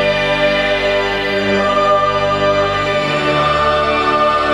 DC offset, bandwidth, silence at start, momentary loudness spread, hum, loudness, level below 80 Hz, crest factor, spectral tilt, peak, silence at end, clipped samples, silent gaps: under 0.1%; 12 kHz; 0 s; 2 LU; none; -14 LUFS; -36 dBFS; 12 dB; -5 dB/octave; -2 dBFS; 0 s; under 0.1%; none